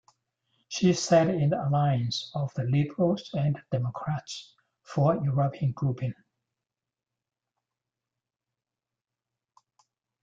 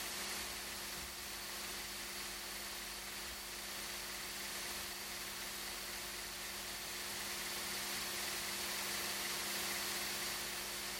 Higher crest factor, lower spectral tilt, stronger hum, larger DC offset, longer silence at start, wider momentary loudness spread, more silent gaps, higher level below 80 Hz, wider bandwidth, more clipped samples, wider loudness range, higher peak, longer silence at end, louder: about the same, 20 dB vs 16 dB; first, -6.5 dB/octave vs -0.5 dB/octave; second, none vs 50 Hz at -65 dBFS; neither; first, 0.7 s vs 0 s; first, 12 LU vs 5 LU; neither; about the same, -64 dBFS vs -64 dBFS; second, 7.8 kHz vs 17 kHz; neither; first, 9 LU vs 4 LU; first, -10 dBFS vs -28 dBFS; first, 4.1 s vs 0 s; first, -27 LUFS vs -41 LUFS